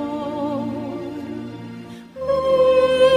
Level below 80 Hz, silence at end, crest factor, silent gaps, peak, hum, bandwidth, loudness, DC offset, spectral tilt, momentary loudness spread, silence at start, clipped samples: -50 dBFS; 0 s; 16 dB; none; -4 dBFS; none; 10 kHz; -21 LUFS; under 0.1%; -6 dB/octave; 20 LU; 0 s; under 0.1%